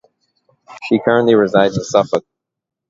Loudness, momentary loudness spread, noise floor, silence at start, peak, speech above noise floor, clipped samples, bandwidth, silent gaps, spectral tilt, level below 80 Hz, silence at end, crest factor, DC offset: -15 LUFS; 9 LU; -61 dBFS; 0.7 s; 0 dBFS; 48 dB; under 0.1%; 7.8 kHz; none; -5.5 dB/octave; -54 dBFS; 0.7 s; 16 dB; under 0.1%